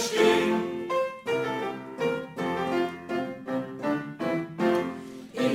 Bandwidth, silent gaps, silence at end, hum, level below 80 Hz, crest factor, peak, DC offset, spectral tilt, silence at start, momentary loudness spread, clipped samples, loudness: 16 kHz; none; 0 s; none; -68 dBFS; 18 dB; -10 dBFS; under 0.1%; -5 dB/octave; 0 s; 10 LU; under 0.1%; -28 LUFS